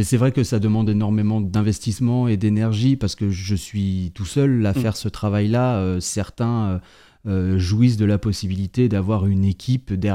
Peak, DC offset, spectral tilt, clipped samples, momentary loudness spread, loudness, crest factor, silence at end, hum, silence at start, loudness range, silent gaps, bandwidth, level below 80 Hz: -4 dBFS; under 0.1%; -7 dB/octave; under 0.1%; 6 LU; -21 LUFS; 14 dB; 0 s; none; 0 s; 2 LU; none; 14.5 kHz; -46 dBFS